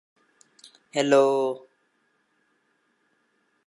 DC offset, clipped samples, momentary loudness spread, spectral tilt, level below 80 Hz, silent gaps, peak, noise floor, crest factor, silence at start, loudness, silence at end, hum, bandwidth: under 0.1%; under 0.1%; 13 LU; -4.5 dB/octave; -86 dBFS; none; -6 dBFS; -70 dBFS; 22 dB; 0.95 s; -23 LUFS; 2.1 s; none; 11.5 kHz